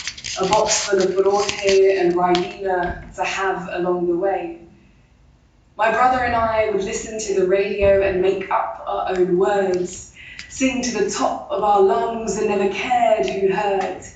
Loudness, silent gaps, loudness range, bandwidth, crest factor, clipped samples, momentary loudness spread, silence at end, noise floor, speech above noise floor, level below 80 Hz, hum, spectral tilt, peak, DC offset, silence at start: -19 LUFS; none; 3 LU; 9 kHz; 18 dB; under 0.1%; 9 LU; 0.05 s; -53 dBFS; 34 dB; -44 dBFS; none; -4 dB/octave; -2 dBFS; under 0.1%; 0 s